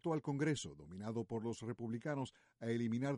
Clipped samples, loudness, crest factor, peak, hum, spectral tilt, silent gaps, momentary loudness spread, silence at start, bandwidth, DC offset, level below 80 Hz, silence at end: under 0.1%; -42 LUFS; 16 dB; -26 dBFS; none; -6.5 dB/octave; none; 10 LU; 0.05 s; 11.5 kHz; under 0.1%; -72 dBFS; 0 s